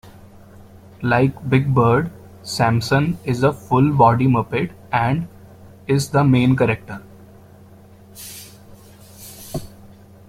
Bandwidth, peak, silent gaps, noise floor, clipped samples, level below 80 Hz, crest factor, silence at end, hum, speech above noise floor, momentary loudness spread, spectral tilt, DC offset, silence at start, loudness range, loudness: 16 kHz; -2 dBFS; none; -45 dBFS; under 0.1%; -48 dBFS; 18 dB; 0.6 s; none; 28 dB; 21 LU; -7 dB/octave; under 0.1%; 0.05 s; 9 LU; -18 LUFS